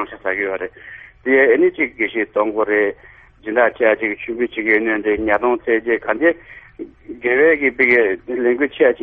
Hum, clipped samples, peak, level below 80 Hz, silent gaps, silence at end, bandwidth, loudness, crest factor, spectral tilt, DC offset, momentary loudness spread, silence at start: none; under 0.1%; 0 dBFS; -50 dBFS; none; 0 s; 4.3 kHz; -17 LUFS; 18 dB; -8 dB/octave; under 0.1%; 16 LU; 0 s